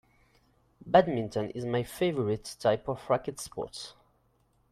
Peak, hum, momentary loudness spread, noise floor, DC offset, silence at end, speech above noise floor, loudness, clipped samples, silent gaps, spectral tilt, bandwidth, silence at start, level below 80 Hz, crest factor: -8 dBFS; none; 14 LU; -69 dBFS; under 0.1%; 0.8 s; 40 dB; -30 LUFS; under 0.1%; none; -5.5 dB/octave; 14.5 kHz; 0.85 s; -60 dBFS; 22 dB